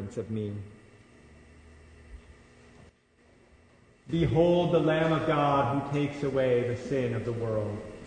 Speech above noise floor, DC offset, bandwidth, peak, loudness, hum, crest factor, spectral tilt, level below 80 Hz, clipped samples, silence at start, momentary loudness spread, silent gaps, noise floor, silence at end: 35 dB; under 0.1%; 9.6 kHz; -12 dBFS; -28 LUFS; none; 18 dB; -7.5 dB/octave; -52 dBFS; under 0.1%; 0 s; 11 LU; none; -62 dBFS; 0 s